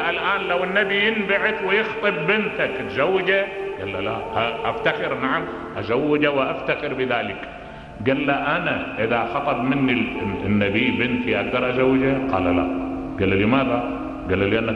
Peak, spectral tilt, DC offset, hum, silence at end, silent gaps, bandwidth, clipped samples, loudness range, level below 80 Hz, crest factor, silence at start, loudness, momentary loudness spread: -4 dBFS; -7.5 dB/octave; under 0.1%; none; 0 s; none; 6.8 kHz; under 0.1%; 3 LU; -46 dBFS; 16 dB; 0 s; -21 LUFS; 8 LU